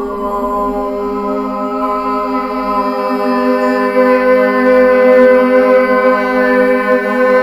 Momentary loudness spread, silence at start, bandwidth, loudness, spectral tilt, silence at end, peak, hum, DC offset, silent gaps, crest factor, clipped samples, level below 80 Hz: 9 LU; 0 s; 13.5 kHz; -12 LUFS; -6.5 dB/octave; 0 s; 0 dBFS; none; under 0.1%; none; 12 dB; under 0.1%; -42 dBFS